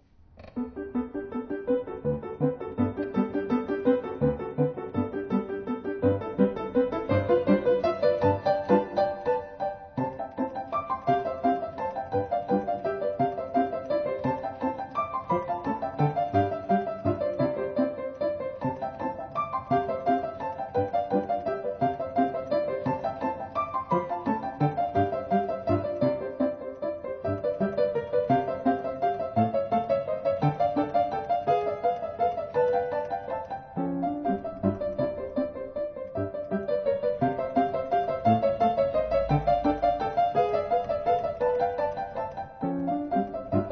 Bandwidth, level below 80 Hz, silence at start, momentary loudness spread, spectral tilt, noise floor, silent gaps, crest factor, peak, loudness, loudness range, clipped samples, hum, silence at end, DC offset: 6.4 kHz; -52 dBFS; 0.35 s; 8 LU; -9.5 dB/octave; -50 dBFS; none; 18 dB; -8 dBFS; -28 LUFS; 4 LU; under 0.1%; none; 0 s; under 0.1%